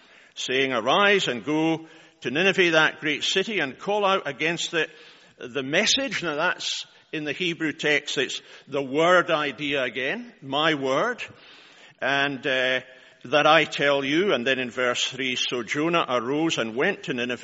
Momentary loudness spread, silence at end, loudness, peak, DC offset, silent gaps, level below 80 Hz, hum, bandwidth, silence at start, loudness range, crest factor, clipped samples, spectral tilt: 12 LU; 0 s; -23 LUFS; -4 dBFS; under 0.1%; none; -70 dBFS; none; 8 kHz; 0.35 s; 3 LU; 22 dB; under 0.1%; -1.5 dB/octave